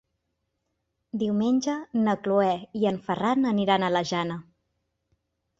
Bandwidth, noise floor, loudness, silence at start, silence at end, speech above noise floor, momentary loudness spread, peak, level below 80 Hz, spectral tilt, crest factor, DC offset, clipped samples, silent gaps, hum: 7.8 kHz; -79 dBFS; -25 LUFS; 1.15 s; 1.15 s; 54 dB; 7 LU; -8 dBFS; -66 dBFS; -6 dB/octave; 20 dB; under 0.1%; under 0.1%; none; none